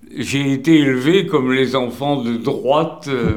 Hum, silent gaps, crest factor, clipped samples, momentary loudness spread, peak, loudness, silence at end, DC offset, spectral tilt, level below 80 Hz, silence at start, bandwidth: none; none; 16 dB; under 0.1%; 7 LU; 0 dBFS; -17 LUFS; 0 s; 0.3%; -6 dB/octave; -48 dBFS; 0.1 s; 17 kHz